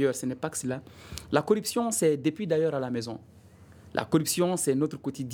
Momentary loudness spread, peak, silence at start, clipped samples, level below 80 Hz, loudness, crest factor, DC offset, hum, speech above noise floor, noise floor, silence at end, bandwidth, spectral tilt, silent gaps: 11 LU; -6 dBFS; 0 s; under 0.1%; -60 dBFS; -28 LUFS; 22 dB; under 0.1%; none; 24 dB; -52 dBFS; 0 s; 19 kHz; -5 dB/octave; none